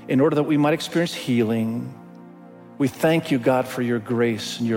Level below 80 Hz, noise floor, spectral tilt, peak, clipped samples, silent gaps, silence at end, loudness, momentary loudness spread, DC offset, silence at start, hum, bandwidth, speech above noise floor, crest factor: -64 dBFS; -44 dBFS; -6 dB/octave; -6 dBFS; under 0.1%; none; 0 s; -22 LUFS; 7 LU; under 0.1%; 0 s; none; 17 kHz; 23 dB; 16 dB